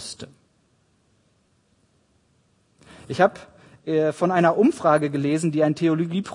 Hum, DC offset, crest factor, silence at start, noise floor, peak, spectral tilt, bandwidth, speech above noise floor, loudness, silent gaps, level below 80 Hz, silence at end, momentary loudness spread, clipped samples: none; under 0.1%; 20 dB; 0 s; -64 dBFS; -4 dBFS; -6.5 dB/octave; 11 kHz; 44 dB; -21 LUFS; none; -68 dBFS; 0 s; 17 LU; under 0.1%